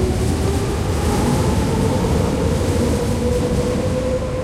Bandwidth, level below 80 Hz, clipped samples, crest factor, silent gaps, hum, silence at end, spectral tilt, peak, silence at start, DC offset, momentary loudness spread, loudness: 15.5 kHz; -26 dBFS; under 0.1%; 12 dB; none; none; 0 s; -6.5 dB/octave; -6 dBFS; 0 s; under 0.1%; 2 LU; -19 LUFS